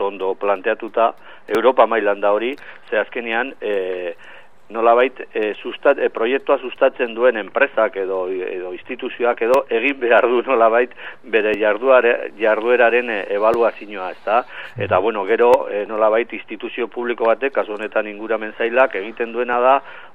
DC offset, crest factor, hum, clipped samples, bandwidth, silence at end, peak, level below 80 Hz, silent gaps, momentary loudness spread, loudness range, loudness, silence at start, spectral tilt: 0.9%; 18 dB; none; under 0.1%; 7.6 kHz; 0.05 s; 0 dBFS; -64 dBFS; none; 11 LU; 4 LU; -18 LUFS; 0 s; -6 dB/octave